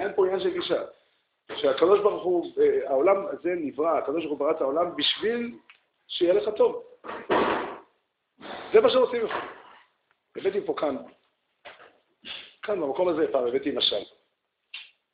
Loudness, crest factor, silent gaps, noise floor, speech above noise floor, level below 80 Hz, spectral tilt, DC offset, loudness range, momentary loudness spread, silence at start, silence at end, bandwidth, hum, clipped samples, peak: -25 LUFS; 20 dB; none; -76 dBFS; 51 dB; -66 dBFS; -2 dB/octave; under 0.1%; 6 LU; 18 LU; 0 s; 0.3 s; 5 kHz; none; under 0.1%; -6 dBFS